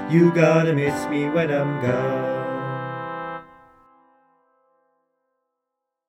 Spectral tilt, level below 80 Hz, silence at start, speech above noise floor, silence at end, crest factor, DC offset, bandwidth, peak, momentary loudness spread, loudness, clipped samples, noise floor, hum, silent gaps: -7.5 dB/octave; -62 dBFS; 0 s; 63 dB; 2.65 s; 20 dB; under 0.1%; 14 kHz; -4 dBFS; 14 LU; -22 LUFS; under 0.1%; -82 dBFS; none; none